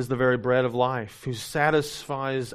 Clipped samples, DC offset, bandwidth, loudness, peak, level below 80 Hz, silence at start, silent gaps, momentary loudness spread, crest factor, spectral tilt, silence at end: under 0.1%; under 0.1%; 15 kHz; -25 LUFS; -6 dBFS; -56 dBFS; 0 s; none; 9 LU; 18 dB; -5.5 dB/octave; 0 s